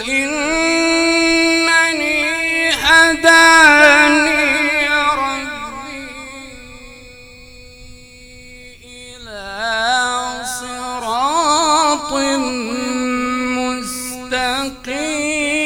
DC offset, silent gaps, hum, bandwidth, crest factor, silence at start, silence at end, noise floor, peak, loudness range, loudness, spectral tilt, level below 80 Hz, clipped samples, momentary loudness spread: under 0.1%; none; none; over 20 kHz; 16 dB; 0 s; 0 s; -39 dBFS; 0 dBFS; 16 LU; -13 LUFS; -1.5 dB/octave; -44 dBFS; under 0.1%; 19 LU